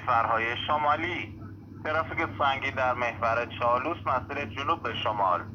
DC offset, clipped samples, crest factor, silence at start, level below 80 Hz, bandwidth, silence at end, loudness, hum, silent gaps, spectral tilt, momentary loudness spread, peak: under 0.1%; under 0.1%; 16 dB; 0 s; -54 dBFS; 7 kHz; 0 s; -28 LUFS; none; none; -6 dB/octave; 8 LU; -12 dBFS